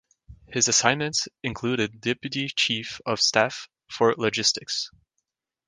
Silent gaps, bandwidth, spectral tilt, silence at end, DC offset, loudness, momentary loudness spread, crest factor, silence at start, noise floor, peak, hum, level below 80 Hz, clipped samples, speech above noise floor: none; 11 kHz; -2 dB/octave; 0.8 s; under 0.1%; -24 LUFS; 10 LU; 24 dB; 0.3 s; -80 dBFS; -2 dBFS; none; -60 dBFS; under 0.1%; 55 dB